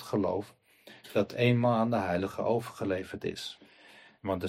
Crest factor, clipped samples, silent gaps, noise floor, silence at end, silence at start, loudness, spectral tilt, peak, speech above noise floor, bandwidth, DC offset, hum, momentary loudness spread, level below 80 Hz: 18 dB; under 0.1%; none; -56 dBFS; 0 s; 0 s; -31 LUFS; -7 dB/octave; -14 dBFS; 27 dB; 15.5 kHz; under 0.1%; none; 15 LU; -66 dBFS